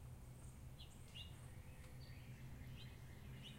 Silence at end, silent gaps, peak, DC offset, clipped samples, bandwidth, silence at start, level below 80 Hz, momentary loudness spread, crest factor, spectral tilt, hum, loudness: 0 s; none; -42 dBFS; under 0.1%; under 0.1%; 16 kHz; 0 s; -62 dBFS; 3 LU; 14 dB; -5 dB/octave; none; -57 LUFS